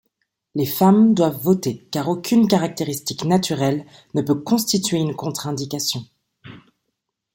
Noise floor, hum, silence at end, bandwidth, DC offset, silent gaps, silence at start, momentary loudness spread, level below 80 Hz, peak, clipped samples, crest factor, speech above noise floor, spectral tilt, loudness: -77 dBFS; none; 0.75 s; 17 kHz; under 0.1%; none; 0.55 s; 11 LU; -60 dBFS; -2 dBFS; under 0.1%; 18 dB; 58 dB; -5.5 dB/octave; -20 LUFS